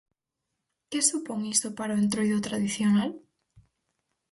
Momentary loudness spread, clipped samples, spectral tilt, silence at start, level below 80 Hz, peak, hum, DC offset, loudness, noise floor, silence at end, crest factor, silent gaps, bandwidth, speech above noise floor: 9 LU; under 0.1%; -3.5 dB/octave; 0.9 s; -66 dBFS; -8 dBFS; none; under 0.1%; -27 LUFS; -84 dBFS; 0.7 s; 20 dB; none; 11.5 kHz; 57 dB